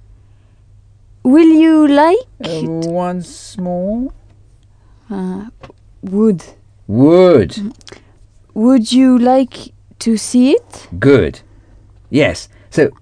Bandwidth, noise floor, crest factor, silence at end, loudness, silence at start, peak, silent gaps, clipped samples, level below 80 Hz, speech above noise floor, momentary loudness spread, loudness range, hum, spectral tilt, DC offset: 10 kHz; -46 dBFS; 14 dB; 0.1 s; -13 LUFS; 1.25 s; 0 dBFS; none; 0.1%; -42 dBFS; 34 dB; 18 LU; 10 LU; none; -6.5 dB/octave; under 0.1%